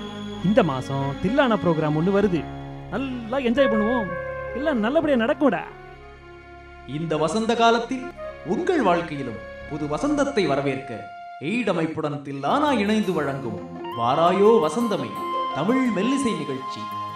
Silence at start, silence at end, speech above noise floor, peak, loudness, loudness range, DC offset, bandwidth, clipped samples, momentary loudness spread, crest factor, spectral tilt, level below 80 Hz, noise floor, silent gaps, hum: 0 s; 0 s; 21 dB; -2 dBFS; -23 LUFS; 3 LU; under 0.1%; 14.5 kHz; under 0.1%; 14 LU; 20 dB; -6 dB/octave; -48 dBFS; -43 dBFS; none; none